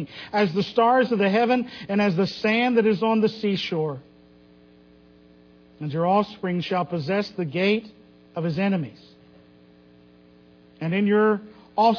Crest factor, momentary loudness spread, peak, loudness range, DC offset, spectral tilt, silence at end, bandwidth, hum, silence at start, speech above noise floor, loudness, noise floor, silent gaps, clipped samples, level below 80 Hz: 18 dB; 10 LU; -6 dBFS; 7 LU; under 0.1%; -7.5 dB/octave; 0 s; 5.4 kHz; 60 Hz at -55 dBFS; 0 s; 30 dB; -23 LUFS; -53 dBFS; none; under 0.1%; -64 dBFS